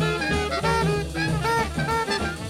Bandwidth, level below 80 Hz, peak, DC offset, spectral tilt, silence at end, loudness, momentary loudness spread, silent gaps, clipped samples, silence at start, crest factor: 16 kHz; -38 dBFS; -10 dBFS; under 0.1%; -5 dB/octave; 0 s; -24 LUFS; 3 LU; none; under 0.1%; 0 s; 14 dB